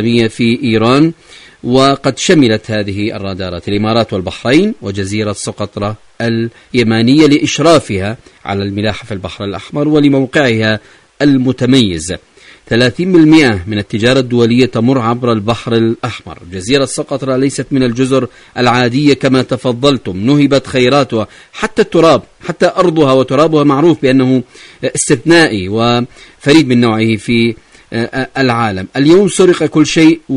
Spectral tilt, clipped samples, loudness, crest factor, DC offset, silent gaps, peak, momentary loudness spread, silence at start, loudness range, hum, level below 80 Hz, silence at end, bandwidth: -5.5 dB/octave; 0.3%; -11 LUFS; 12 dB; under 0.1%; none; 0 dBFS; 12 LU; 0 s; 4 LU; none; -42 dBFS; 0 s; 11 kHz